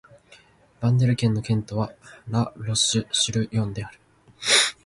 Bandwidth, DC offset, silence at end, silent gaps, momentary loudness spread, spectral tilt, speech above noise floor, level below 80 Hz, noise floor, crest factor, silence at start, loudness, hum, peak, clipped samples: 11.5 kHz; under 0.1%; 0.15 s; none; 12 LU; -3.5 dB/octave; 30 dB; -52 dBFS; -54 dBFS; 22 dB; 0.8 s; -23 LUFS; none; -4 dBFS; under 0.1%